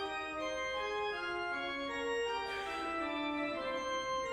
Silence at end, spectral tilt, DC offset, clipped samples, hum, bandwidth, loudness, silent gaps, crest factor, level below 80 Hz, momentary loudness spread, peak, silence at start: 0 s; -3 dB/octave; under 0.1%; under 0.1%; none; 13.5 kHz; -37 LUFS; none; 12 dB; -64 dBFS; 2 LU; -26 dBFS; 0 s